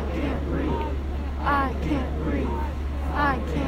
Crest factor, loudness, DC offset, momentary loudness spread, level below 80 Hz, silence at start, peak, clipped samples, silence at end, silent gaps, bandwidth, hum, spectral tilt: 16 dB; -27 LUFS; under 0.1%; 6 LU; -28 dBFS; 0 s; -8 dBFS; under 0.1%; 0 s; none; 8.2 kHz; none; -7.5 dB/octave